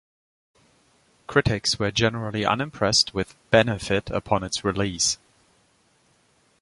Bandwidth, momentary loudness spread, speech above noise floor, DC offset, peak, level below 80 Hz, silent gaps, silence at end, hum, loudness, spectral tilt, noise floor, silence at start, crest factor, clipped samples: 11.5 kHz; 6 LU; 40 dB; under 0.1%; -2 dBFS; -46 dBFS; none; 1.45 s; none; -23 LUFS; -3.5 dB/octave; -63 dBFS; 1.3 s; 24 dB; under 0.1%